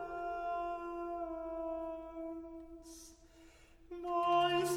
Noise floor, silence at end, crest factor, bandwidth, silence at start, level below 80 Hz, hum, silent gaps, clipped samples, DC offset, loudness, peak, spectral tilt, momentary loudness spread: -61 dBFS; 0 s; 18 dB; 16.5 kHz; 0 s; -62 dBFS; none; none; under 0.1%; under 0.1%; -38 LUFS; -20 dBFS; -4 dB/octave; 21 LU